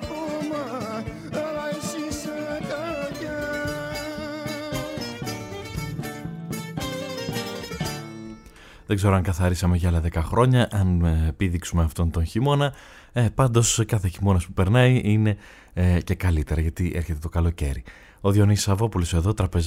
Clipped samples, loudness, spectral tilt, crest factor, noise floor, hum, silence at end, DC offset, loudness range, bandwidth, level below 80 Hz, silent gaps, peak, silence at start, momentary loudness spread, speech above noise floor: under 0.1%; -24 LUFS; -6 dB/octave; 18 dB; -47 dBFS; none; 0 s; under 0.1%; 10 LU; 16 kHz; -34 dBFS; none; -6 dBFS; 0 s; 13 LU; 25 dB